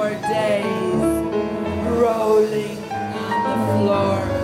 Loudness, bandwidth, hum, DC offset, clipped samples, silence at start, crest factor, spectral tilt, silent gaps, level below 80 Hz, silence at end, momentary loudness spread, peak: -20 LUFS; 16 kHz; none; under 0.1%; under 0.1%; 0 s; 14 dB; -6.5 dB/octave; none; -44 dBFS; 0 s; 8 LU; -6 dBFS